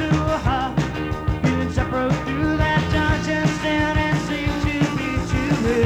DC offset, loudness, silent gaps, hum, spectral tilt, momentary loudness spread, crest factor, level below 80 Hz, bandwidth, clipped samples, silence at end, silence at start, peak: under 0.1%; -21 LUFS; none; none; -6.5 dB/octave; 4 LU; 14 dB; -30 dBFS; 13.5 kHz; under 0.1%; 0 s; 0 s; -6 dBFS